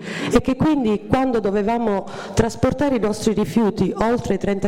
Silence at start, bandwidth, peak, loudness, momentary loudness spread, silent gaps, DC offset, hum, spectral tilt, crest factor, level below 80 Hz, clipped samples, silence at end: 0 s; 15.5 kHz; -6 dBFS; -20 LUFS; 3 LU; none; under 0.1%; none; -6.5 dB/octave; 14 dB; -38 dBFS; under 0.1%; 0 s